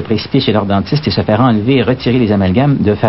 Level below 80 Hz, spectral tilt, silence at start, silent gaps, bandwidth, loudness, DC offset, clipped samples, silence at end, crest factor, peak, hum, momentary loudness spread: -40 dBFS; -10 dB/octave; 0 s; none; 5.8 kHz; -12 LUFS; 0.7%; under 0.1%; 0 s; 12 dB; 0 dBFS; none; 3 LU